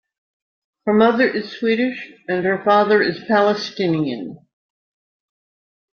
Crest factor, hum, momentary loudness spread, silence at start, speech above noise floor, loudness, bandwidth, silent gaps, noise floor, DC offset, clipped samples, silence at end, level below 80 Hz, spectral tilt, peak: 18 dB; none; 11 LU; 0.85 s; over 72 dB; -18 LUFS; 6.8 kHz; none; under -90 dBFS; under 0.1%; under 0.1%; 1.65 s; -64 dBFS; -6.5 dB/octave; -2 dBFS